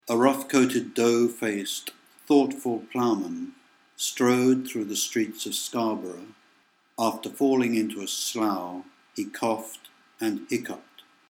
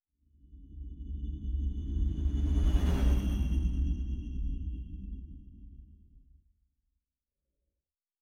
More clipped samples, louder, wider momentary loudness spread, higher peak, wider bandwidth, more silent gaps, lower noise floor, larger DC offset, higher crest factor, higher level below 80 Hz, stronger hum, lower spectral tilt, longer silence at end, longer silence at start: neither; first, -26 LUFS vs -34 LUFS; second, 16 LU vs 21 LU; first, -6 dBFS vs -16 dBFS; first, 17.5 kHz vs 9.6 kHz; neither; second, -64 dBFS vs under -90 dBFS; neither; about the same, 20 dB vs 18 dB; second, -82 dBFS vs -34 dBFS; neither; second, -4 dB/octave vs -7.5 dB/octave; second, 0.5 s vs 2.05 s; second, 0.05 s vs 0.5 s